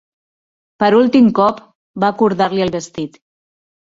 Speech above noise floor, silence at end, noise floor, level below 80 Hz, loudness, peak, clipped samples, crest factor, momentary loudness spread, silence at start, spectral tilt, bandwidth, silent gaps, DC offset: over 76 dB; 0.85 s; under -90 dBFS; -56 dBFS; -14 LUFS; -2 dBFS; under 0.1%; 14 dB; 17 LU; 0.8 s; -6.5 dB/octave; 7.8 kHz; 1.75-1.94 s; under 0.1%